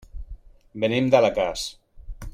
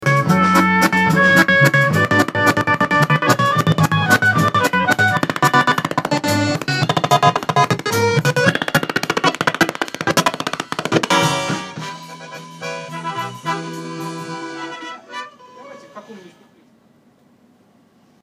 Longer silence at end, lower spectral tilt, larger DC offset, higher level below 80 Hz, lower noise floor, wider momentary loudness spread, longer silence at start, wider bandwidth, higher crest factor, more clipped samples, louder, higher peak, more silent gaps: second, 0.05 s vs 2 s; about the same, -5 dB/octave vs -4.5 dB/octave; neither; first, -42 dBFS vs -56 dBFS; second, -42 dBFS vs -54 dBFS; first, 24 LU vs 16 LU; first, 0.15 s vs 0 s; about the same, 15.5 kHz vs 16 kHz; about the same, 22 dB vs 18 dB; neither; second, -22 LUFS vs -16 LUFS; second, -4 dBFS vs 0 dBFS; neither